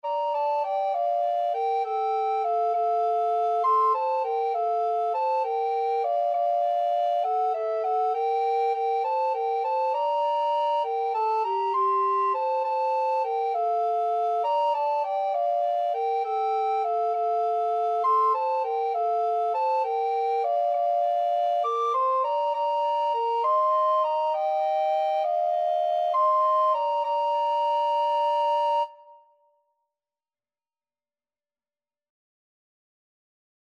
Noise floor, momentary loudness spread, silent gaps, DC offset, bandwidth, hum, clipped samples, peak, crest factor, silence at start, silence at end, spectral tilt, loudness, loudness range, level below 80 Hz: under -90 dBFS; 3 LU; none; under 0.1%; 7.4 kHz; none; under 0.1%; -14 dBFS; 10 dB; 0.05 s; 4.6 s; -1 dB/octave; -25 LUFS; 2 LU; under -90 dBFS